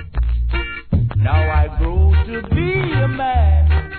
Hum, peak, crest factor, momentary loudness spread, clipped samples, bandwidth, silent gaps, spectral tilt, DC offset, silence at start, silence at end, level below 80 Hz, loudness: none; -4 dBFS; 10 dB; 6 LU; under 0.1%; 4.5 kHz; none; -11 dB/octave; 0.3%; 0 s; 0 s; -18 dBFS; -18 LUFS